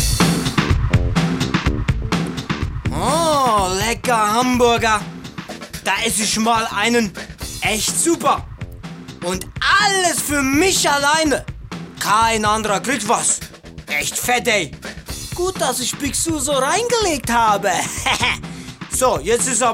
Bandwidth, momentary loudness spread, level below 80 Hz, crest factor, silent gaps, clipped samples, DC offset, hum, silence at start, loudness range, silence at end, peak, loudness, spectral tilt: 16 kHz; 15 LU; -32 dBFS; 16 dB; none; under 0.1%; under 0.1%; none; 0 s; 3 LU; 0 s; -4 dBFS; -17 LUFS; -3.5 dB/octave